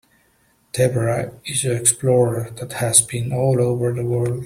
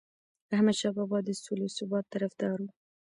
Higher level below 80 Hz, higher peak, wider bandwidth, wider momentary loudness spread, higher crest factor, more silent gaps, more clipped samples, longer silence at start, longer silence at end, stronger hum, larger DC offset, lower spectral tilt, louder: first, -52 dBFS vs -76 dBFS; first, 0 dBFS vs -16 dBFS; first, 16 kHz vs 11 kHz; about the same, 10 LU vs 8 LU; about the same, 20 dB vs 16 dB; neither; neither; first, 0.75 s vs 0.5 s; second, 0 s vs 0.35 s; neither; neither; about the same, -4.5 dB/octave vs -5.5 dB/octave; first, -19 LUFS vs -31 LUFS